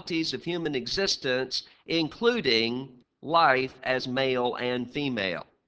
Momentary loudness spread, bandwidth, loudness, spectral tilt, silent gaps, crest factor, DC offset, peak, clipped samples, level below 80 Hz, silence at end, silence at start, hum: 8 LU; 8 kHz; -27 LUFS; -4 dB/octave; none; 22 dB; under 0.1%; -6 dBFS; under 0.1%; -60 dBFS; 0.25 s; 0.05 s; none